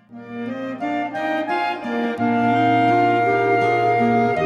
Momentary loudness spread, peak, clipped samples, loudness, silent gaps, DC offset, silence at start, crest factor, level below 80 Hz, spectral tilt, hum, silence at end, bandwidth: 11 LU; -6 dBFS; under 0.1%; -19 LUFS; none; under 0.1%; 0.1 s; 12 dB; -60 dBFS; -7 dB/octave; none; 0 s; 11 kHz